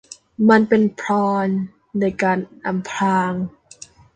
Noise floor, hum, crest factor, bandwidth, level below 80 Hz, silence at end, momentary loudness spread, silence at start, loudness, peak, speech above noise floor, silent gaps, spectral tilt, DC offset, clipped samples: -44 dBFS; none; 18 dB; 9 kHz; -58 dBFS; 0.65 s; 12 LU; 0.1 s; -19 LUFS; -2 dBFS; 26 dB; none; -6.5 dB/octave; under 0.1%; under 0.1%